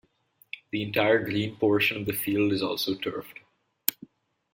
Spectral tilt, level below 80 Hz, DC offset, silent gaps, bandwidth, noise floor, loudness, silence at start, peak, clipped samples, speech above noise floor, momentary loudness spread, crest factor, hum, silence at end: -4.5 dB/octave; -64 dBFS; under 0.1%; none; 16.5 kHz; -64 dBFS; -27 LUFS; 0.55 s; 0 dBFS; under 0.1%; 38 dB; 14 LU; 28 dB; none; 0.6 s